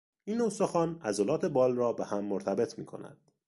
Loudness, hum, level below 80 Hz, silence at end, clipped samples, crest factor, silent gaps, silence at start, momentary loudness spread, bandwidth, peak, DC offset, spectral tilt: -31 LUFS; none; -70 dBFS; 0.35 s; under 0.1%; 16 dB; none; 0.25 s; 16 LU; 11.5 kHz; -16 dBFS; under 0.1%; -6 dB/octave